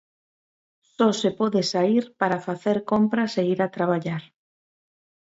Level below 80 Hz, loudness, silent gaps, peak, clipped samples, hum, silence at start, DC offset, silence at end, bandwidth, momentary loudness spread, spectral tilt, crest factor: -68 dBFS; -23 LUFS; none; -6 dBFS; under 0.1%; none; 1 s; under 0.1%; 1.1 s; 8 kHz; 5 LU; -6 dB/octave; 18 dB